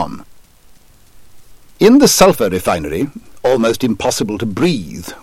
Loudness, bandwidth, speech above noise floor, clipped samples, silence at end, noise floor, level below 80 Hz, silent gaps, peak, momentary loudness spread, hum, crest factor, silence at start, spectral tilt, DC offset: -14 LUFS; 17 kHz; 30 dB; under 0.1%; 0.05 s; -44 dBFS; -42 dBFS; none; 0 dBFS; 15 LU; none; 16 dB; 0 s; -4.5 dB/octave; under 0.1%